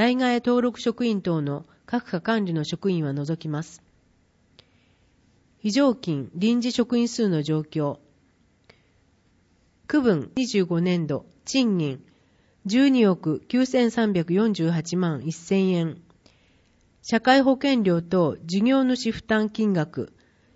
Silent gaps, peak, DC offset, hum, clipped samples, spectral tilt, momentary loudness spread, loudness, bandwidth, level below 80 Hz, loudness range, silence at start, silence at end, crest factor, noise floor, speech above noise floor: none; -6 dBFS; under 0.1%; none; under 0.1%; -6 dB/octave; 11 LU; -23 LUFS; 8 kHz; -62 dBFS; 6 LU; 0 s; 0.5 s; 18 dB; -63 dBFS; 40 dB